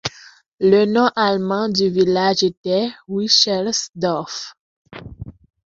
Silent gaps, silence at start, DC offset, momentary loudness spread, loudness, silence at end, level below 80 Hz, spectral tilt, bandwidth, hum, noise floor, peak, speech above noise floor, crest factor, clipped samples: 0.46-0.58 s, 2.57-2.64 s, 4.60-4.85 s; 0.05 s; under 0.1%; 21 LU; -17 LUFS; 0.5 s; -52 dBFS; -4 dB/octave; 7.8 kHz; none; -46 dBFS; 0 dBFS; 29 dB; 18 dB; under 0.1%